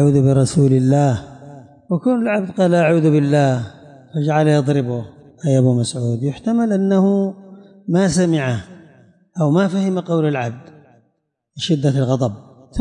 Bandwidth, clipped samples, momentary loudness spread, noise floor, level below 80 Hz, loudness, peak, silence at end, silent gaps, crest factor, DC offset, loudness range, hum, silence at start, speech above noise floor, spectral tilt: 11 kHz; under 0.1%; 13 LU; -69 dBFS; -50 dBFS; -17 LUFS; -4 dBFS; 0 s; none; 12 dB; under 0.1%; 4 LU; none; 0 s; 53 dB; -7 dB/octave